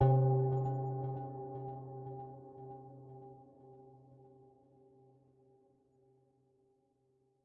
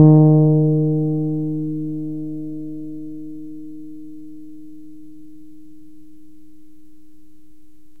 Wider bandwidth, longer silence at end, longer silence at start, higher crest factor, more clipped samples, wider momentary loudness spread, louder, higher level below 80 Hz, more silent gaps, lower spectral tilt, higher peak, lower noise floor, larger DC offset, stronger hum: first, 1.9 kHz vs 1.3 kHz; first, 3.3 s vs 3.05 s; about the same, 0 s vs 0 s; about the same, 22 dB vs 20 dB; neither; about the same, 27 LU vs 27 LU; second, -37 LUFS vs -18 LUFS; second, -66 dBFS vs -56 dBFS; neither; second, -11.5 dB/octave vs -14 dB/octave; second, -18 dBFS vs 0 dBFS; first, -76 dBFS vs -53 dBFS; second, under 0.1% vs 2%; neither